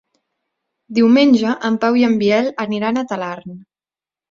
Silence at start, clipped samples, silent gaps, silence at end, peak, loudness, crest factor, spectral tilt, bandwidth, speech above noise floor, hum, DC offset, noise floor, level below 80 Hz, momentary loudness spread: 0.9 s; under 0.1%; none; 0.7 s; -2 dBFS; -16 LUFS; 14 dB; -6 dB/octave; 7.4 kHz; over 75 dB; none; under 0.1%; under -90 dBFS; -60 dBFS; 13 LU